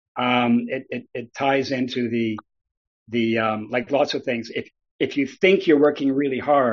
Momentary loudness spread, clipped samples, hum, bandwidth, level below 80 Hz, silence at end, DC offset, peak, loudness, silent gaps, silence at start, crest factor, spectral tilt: 12 LU; under 0.1%; none; 7.2 kHz; -66 dBFS; 0 s; under 0.1%; -4 dBFS; -22 LUFS; 2.77-3.06 s, 4.91-4.99 s; 0.15 s; 18 dB; -3.5 dB/octave